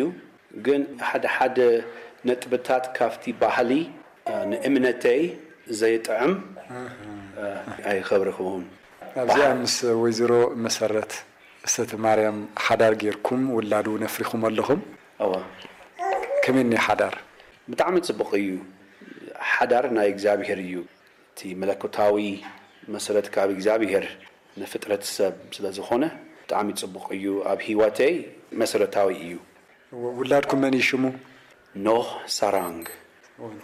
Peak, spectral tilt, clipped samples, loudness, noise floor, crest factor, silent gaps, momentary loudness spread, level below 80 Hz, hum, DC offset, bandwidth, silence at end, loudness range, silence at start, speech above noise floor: -10 dBFS; -4 dB/octave; under 0.1%; -24 LUFS; -45 dBFS; 14 dB; none; 17 LU; -66 dBFS; none; under 0.1%; 16 kHz; 0 s; 4 LU; 0 s; 22 dB